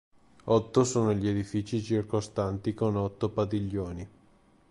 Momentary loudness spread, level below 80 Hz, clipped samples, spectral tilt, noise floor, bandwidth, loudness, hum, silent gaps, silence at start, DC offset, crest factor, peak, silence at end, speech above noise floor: 10 LU; -52 dBFS; under 0.1%; -6.5 dB/octave; -61 dBFS; 11.5 kHz; -29 LUFS; none; none; 0.45 s; under 0.1%; 18 dB; -12 dBFS; 0.65 s; 33 dB